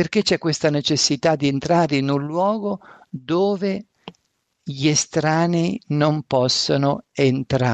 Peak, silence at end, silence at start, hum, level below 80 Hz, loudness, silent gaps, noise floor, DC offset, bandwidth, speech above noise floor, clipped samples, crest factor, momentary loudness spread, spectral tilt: -6 dBFS; 0 s; 0 s; none; -54 dBFS; -20 LUFS; none; -71 dBFS; under 0.1%; 9.2 kHz; 51 dB; under 0.1%; 16 dB; 8 LU; -5 dB/octave